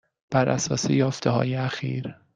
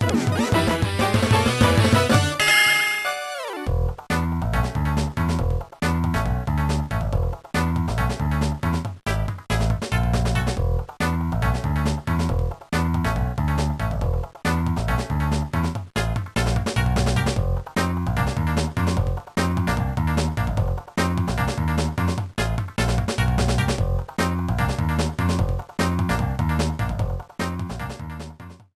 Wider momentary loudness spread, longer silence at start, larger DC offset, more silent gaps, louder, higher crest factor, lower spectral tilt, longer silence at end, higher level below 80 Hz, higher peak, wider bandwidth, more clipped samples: about the same, 7 LU vs 7 LU; first, 0.3 s vs 0 s; neither; neither; about the same, -25 LUFS vs -23 LUFS; about the same, 18 dB vs 18 dB; about the same, -5.5 dB/octave vs -5.5 dB/octave; about the same, 0.25 s vs 0.2 s; second, -58 dBFS vs -30 dBFS; second, -8 dBFS vs -4 dBFS; second, 9.2 kHz vs 14.5 kHz; neither